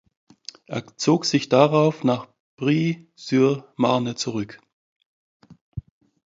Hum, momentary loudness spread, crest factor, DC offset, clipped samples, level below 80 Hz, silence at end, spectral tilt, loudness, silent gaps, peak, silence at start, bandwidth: none; 21 LU; 22 dB; under 0.1%; under 0.1%; -56 dBFS; 0.5 s; -5.5 dB/octave; -22 LUFS; 2.40-2.58 s, 4.73-5.00 s, 5.06-5.40 s, 5.61-5.72 s; -2 dBFS; 0.7 s; 7.8 kHz